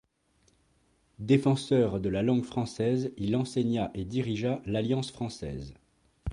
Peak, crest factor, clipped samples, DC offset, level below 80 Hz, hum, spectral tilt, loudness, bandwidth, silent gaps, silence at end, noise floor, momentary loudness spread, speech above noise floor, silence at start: -12 dBFS; 18 dB; under 0.1%; under 0.1%; -52 dBFS; none; -7 dB/octave; -29 LUFS; 11.5 kHz; none; 0 s; -69 dBFS; 13 LU; 40 dB; 1.2 s